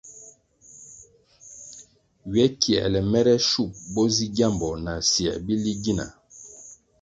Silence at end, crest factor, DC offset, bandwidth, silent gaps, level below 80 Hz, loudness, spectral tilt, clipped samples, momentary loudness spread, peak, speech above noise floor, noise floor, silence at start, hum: 0.25 s; 22 dB; under 0.1%; 9.2 kHz; none; -48 dBFS; -23 LUFS; -4.5 dB/octave; under 0.1%; 23 LU; -2 dBFS; 29 dB; -52 dBFS; 0.05 s; none